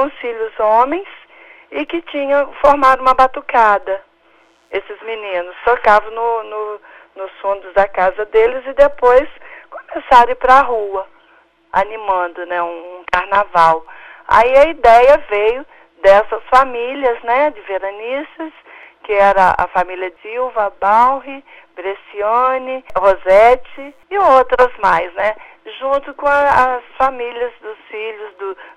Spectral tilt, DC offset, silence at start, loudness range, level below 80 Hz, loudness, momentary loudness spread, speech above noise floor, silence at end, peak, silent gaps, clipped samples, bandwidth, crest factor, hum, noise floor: -4.5 dB/octave; under 0.1%; 0 s; 5 LU; -40 dBFS; -14 LUFS; 17 LU; 38 dB; 0.1 s; 0 dBFS; none; under 0.1%; 10.5 kHz; 14 dB; 60 Hz at -65 dBFS; -52 dBFS